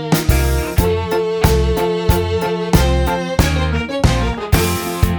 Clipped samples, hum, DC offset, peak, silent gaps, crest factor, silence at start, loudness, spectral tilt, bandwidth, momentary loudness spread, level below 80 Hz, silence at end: under 0.1%; none; under 0.1%; 0 dBFS; none; 16 dB; 0 s; -16 LUFS; -5.5 dB/octave; over 20 kHz; 4 LU; -20 dBFS; 0 s